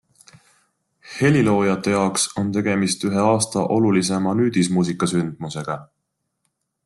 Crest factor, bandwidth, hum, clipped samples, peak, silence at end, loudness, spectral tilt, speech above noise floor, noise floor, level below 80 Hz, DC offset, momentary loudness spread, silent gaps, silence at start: 16 dB; 12.5 kHz; none; under 0.1%; -4 dBFS; 1 s; -20 LUFS; -5 dB/octave; 54 dB; -73 dBFS; -58 dBFS; under 0.1%; 10 LU; none; 1.05 s